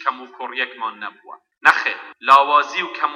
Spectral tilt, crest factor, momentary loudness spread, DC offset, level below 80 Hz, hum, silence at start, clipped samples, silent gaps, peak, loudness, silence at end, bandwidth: -1.5 dB/octave; 18 dB; 17 LU; under 0.1%; -70 dBFS; none; 0 s; under 0.1%; none; 0 dBFS; -17 LUFS; 0 s; 14 kHz